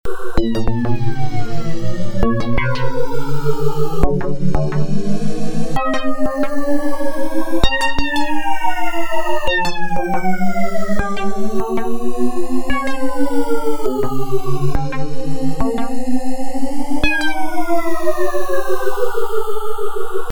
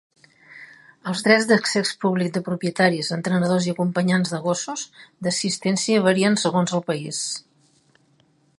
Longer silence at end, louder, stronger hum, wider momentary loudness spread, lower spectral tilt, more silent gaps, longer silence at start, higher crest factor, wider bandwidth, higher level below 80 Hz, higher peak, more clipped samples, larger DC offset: second, 0 s vs 1.2 s; about the same, -21 LUFS vs -21 LUFS; neither; second, 6 LU vs 11 LU; first, -6 dB/octave vs -4.5 dB/octave; neither; second, 0.05 s vs 0.5 s; second, 10 dB vs 20 dB; first, 19.5 kHz vs 11.5 kHz; first, -28 dBFS vs -68 dBFS; about the same, 0 dBFS vs -2 dBFS; neither; neither